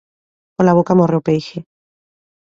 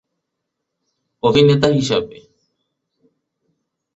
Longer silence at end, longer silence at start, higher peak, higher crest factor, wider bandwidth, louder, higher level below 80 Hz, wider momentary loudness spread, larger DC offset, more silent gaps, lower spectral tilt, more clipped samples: second, 0.8 s vs 1.9 s; second, 0.6 s vs 1.25 s; about the same, -2 dBFS vs -2 dBFS; about the same, 16 dB vs 18 dB; about the same, 7.4 kHz vs 8 kHz; about the same, -15 LUFS vs -15 LUFS; about the same, -56 dBFS vs -52 dBFS; first, 20 LU vs 9 LU; neither; neither; first, -8.5 dB/octave vs -6 dB/octave; neither